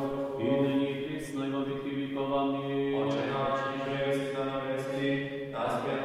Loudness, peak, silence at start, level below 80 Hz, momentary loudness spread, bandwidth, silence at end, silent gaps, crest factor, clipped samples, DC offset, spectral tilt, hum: -31 LUFS; -16 dBFS; 0 s; -64 dBFS; 5 LU; 13 kHz; 0 s; none; 16 dB; under 0.1%; under 0.1%; -6.5 dB/octave; none